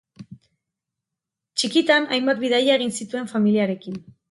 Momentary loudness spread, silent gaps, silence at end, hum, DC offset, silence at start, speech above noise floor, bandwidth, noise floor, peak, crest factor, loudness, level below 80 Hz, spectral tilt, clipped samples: 12 LU; none; 0.3 s; none; under 0.1%; 0.2 s; 65 dB; 11.5 kHz; -85 dBFS; -6 dBFS; 18 dB; -21 LUFS; -70 dBFS; -4 dB/octave; under 0.1%